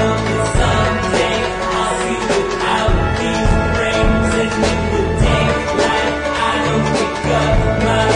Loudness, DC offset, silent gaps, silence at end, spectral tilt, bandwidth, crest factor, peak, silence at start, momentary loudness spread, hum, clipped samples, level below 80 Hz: -16 LUFS; under 0.1%; none; 0 s; -5 dB/octave; 10.5 kHz; 14 dB; -2 dBFS; 0 s; 3 LU; none; under 0.1%; -24 dBFS